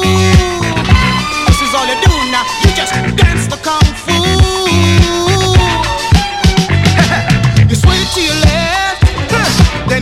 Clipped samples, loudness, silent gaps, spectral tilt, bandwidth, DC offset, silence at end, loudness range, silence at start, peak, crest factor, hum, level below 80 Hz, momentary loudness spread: 1%; -10 LUFS; none; -4.5 dB/octave; 15.5 kHz; under 0.1%; 0 s; 1 LU; 0 s; 0 dBFS; 10 dB; none; -18 dBFS; 4 LU